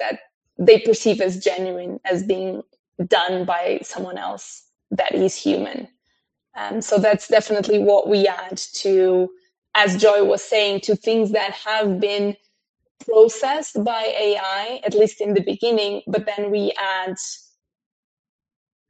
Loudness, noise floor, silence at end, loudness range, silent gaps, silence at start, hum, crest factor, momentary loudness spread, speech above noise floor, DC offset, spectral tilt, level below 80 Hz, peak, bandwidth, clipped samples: -19 LUFS; -72 dBFS; 1.55 s; 6 LU; 0.34-0.41 s, 2.79-2.92 s, 9.58-9.62 s, 12.69-12.74 s, 12.91-12.95 s; 0 s; none; 20 dB; 15 LU; 53 dB; under 0.1%; -4 dB/octave; -68 dBFS; 0 dBFS; 8.8 kHz; under 0.1%